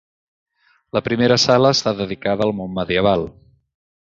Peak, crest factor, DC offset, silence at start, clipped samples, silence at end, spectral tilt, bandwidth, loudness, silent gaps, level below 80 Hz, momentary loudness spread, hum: -2 dBFS; 18 dB; under 0.1%; 0.95 s; under 0.1%; 0.8 s; -4.5 dB/octave; 7.8 kHz; -18 LUFS; none; -48 dBFS; 11 LU; none